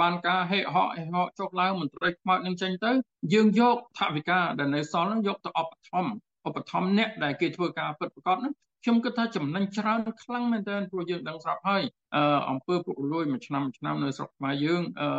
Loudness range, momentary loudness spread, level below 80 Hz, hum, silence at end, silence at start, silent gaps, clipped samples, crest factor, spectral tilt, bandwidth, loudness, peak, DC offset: 4 LU; 8 LU; -74 dBFS; none; 0 s; 0 s; none; under 0.1%; 18 dB; -6.5 dB/octave; 8 kHz; -28 LUFS; -10 dBFS; under 0.1%